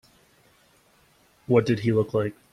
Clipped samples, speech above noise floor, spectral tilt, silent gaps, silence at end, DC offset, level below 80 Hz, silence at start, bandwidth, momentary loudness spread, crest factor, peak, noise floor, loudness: under 0.1%; 38 dB; -8 dB/octave; none; 0.2 s; under 0.1%; -60 dBFS; 1.5 s; 13 kHz; 5 LU; 20 dB; -6 dBFS; -61 dBFS; -24 LUFS